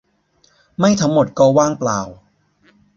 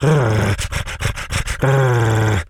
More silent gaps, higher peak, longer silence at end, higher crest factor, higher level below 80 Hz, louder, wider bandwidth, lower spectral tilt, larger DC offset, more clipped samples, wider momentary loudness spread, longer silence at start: neither; about the same, -2 dBFS vs -2 dBFS; first, 0.8 s vs 0.05 s; about the same, 16 dB vs 14 dB; second, -52 dBFS vs -30 dBFS; about the same, -16 LUFS vs -18 LUFS; second, 7.8 kHz vs 15 kHz; about the same, -5.5 dB/octave vs -5.5 dB/octave; neither; neither; first, 14 LU vs 8 LU; first, 0.8 s vs 0 s